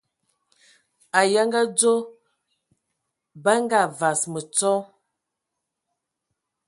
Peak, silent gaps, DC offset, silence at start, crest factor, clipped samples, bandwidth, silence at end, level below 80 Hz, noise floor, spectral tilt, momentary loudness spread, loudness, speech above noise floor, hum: -2 dBFS; none; under 0.1%; 1.15 s; 22 dB; under 0.1%; 11.5 kHz; 1.85 s; -76 dBFS; -82 dBFS; -2.5 dB/octave; 7 LU; -21 LUFS; 61 dB; none